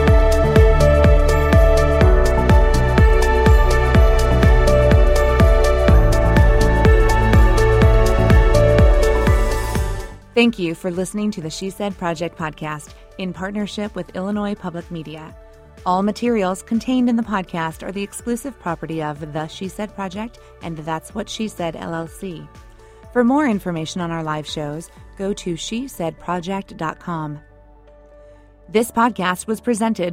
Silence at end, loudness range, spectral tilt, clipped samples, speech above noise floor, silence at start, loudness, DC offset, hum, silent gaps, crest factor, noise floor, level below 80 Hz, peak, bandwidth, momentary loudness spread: 0 s; 12 LU; -6.5 dB/octave; under 0.1%; 23 dB; 0 s; -18 LUFS; under 0.1%; none; none; 16 dB; -46 dBFS; -20 dBFS; 0 dBFS; 15 kHz; 14 LU